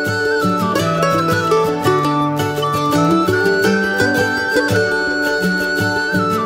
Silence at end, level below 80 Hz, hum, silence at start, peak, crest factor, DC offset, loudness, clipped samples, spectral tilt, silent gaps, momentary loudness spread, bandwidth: 0 s; -48 dBFS; none; 0 s; -2 dBFS; 14 dB; under 0.1%; -16 LUFS; under 0.1%; -5 dB/octave; none; 3 LU; 16.5 kHz